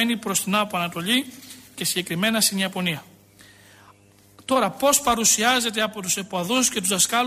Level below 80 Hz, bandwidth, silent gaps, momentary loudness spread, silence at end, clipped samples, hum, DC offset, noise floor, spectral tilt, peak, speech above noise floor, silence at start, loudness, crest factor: -58 dBFS; 15.5 kHz; none; 9 LU; 0 s; under 0.1%; none; under 0.1%; -53 dBFS; -2 dB/octave; -6 dBFS; 31 dB; 0 s; -21 LUFS; 18 dB